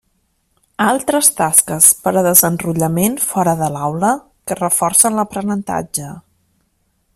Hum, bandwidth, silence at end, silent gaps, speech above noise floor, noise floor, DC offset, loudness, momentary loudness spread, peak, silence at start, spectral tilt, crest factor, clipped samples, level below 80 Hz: none; over 20 kHz; 0.95 s; none; 49 dB; -64 dBFS; under 0.1%; -14 LUFS; 11 LU; 0 dBFS; 0.8 s; -3.5 dB/octave; 16 dB; 0.1%; -52 dBFS